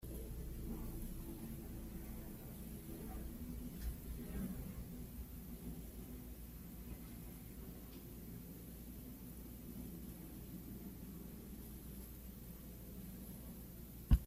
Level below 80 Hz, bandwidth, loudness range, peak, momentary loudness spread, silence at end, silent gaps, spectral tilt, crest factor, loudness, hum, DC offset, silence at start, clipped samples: -50 dBFS; 16 kHz; 3 LU; -18 dBFS; 5 LU; 0 s; none; -6.5 dB/octave; 28 dB; -51 LUFS; none; under 0.1%; 0 s; under 0.1%